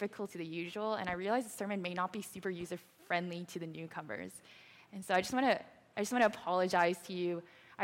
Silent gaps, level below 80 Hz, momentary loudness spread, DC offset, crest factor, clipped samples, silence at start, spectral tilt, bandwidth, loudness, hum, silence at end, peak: none; -74 dBFS; 14 LU; under 0.1%; 20 dB; under 0.1%; 0 s; -4.5 dB/octave; 17 kHz; -36 LUFS; none; 0 s; -16 dBFS